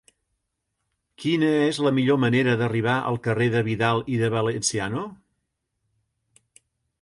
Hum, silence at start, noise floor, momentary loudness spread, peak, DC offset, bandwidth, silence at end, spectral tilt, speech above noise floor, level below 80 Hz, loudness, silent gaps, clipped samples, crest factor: none; 1.2 s; -78 dBFS; 7 LU; -6 dBFS; under 0.1%; 11.5 kHz; 1.9 s; -5.5 dB/octave; 56 dB; -60 dBFS; -23 LUFS; none; under 0.1%; 18 dB